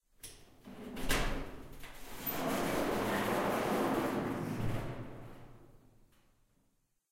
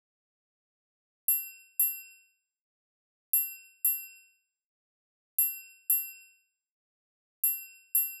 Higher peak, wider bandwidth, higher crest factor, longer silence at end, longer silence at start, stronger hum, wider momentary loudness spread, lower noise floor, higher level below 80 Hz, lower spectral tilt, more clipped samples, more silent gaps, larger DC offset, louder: about the same, -18 dBFS vs -16 dBFS; second, 16 kHz vs over 20 kHz; about the same, 18 dB vs 20 dB; first, 1.35 s vs 0 s; second, 0.25 s vs 1.3 s; neither; first, 19 LU vs 9 LU; first, -76 dBFS vs -67 dBFS; first, -48 dBFS vs under -90 dBFS; first, -5 dB/octave vs 10 dB/octave; neither; second, none vs 2.61-3.33 s, 4.66-5.38 s, 6.71-7.43 s; neither; second, -36 LUFS vs -29 LUFS